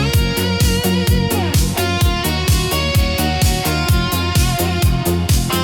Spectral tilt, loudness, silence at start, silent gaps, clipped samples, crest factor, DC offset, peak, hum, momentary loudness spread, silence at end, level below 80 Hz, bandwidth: -4.5 dB/octave; -16 LUFS; 0 s; none; under 0.1%; 12 dB; under 0.1%; -4 dBFS; none; 1 LU; 0 s; -22 dBFS; over 20 kHz